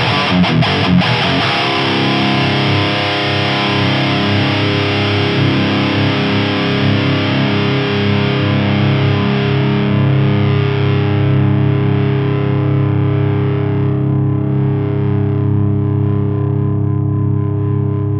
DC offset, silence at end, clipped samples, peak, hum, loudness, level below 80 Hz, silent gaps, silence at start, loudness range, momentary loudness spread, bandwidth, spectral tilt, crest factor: under 0.1%; 0 s; under 0.1%; -2 dBFS; none; -14 LUFS; -42 dBFS; none; 0 s; 2 LU; 3 LU; 7 kHz; -7.5 dB/octave; 12 dB